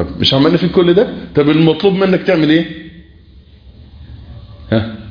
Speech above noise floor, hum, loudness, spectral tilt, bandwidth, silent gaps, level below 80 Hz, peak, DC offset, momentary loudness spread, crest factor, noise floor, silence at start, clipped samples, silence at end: 29 dB; none; -12 LUFS; -7.5 dB/octave; 5.2 kHz; none; -38 dBFS; 0 dBFS; under 0.1%; 7 LU; 14 dB; -41 dBFS; 0 s; under 0.1%; 0 s